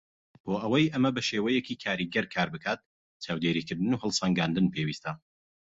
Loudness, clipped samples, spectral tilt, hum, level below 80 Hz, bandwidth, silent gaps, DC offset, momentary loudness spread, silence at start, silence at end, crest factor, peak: -29 LUFS; under 0.1%; -5 dB/octave; none; -62 dBFS; 8 kHz; 2.86-3.20 s; under 0.1%; 11 LU; 0.45 s; 0.6 s; 18 dB; -12 dBFS